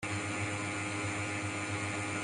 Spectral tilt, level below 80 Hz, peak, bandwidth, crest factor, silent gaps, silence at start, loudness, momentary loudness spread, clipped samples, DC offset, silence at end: -4 dB/octave; -66 dBFS; -24 dBFS; 11.5 kHz; 12 dB; none; 0 s; -35 LUFS; 1 LU; under 0.1%; under 0.1%; 0 s